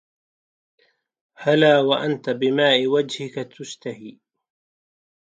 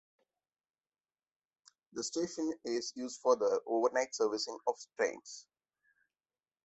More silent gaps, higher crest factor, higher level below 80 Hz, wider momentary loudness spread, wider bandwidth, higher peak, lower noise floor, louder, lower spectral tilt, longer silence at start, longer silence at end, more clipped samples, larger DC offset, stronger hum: neither; about the same, 20 dB vs 22 dB; first, -74 dBFS vs -82 dBFS; first, 18 LU vs 12 LU; first, 9.2 kHz vs 8.2 kHz; first, -4 dBFS vs -16 dBFS; about the same, under -90 dBFS vs under -90 dBFS; first, -19 LUFS vs -35 LUFS; first, -5 dB/octave vs -2.5 dB/octave; second, 1.4 s vs 1.95 s; about the same, 1.3 s vs 1.25 s; neither; neither; neither